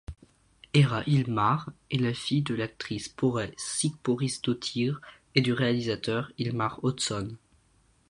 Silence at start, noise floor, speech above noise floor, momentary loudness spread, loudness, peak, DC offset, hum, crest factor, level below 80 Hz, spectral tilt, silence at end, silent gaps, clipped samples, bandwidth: 0.1 s; -65 dBFS; 37 dB; 9 LU; -28 LUFS; -8 dBFS; under 0.1%; none; 22 dB; -56 dBFS; -5 dB/octave; 0.75 s; none; under 0.1%; 11 kHz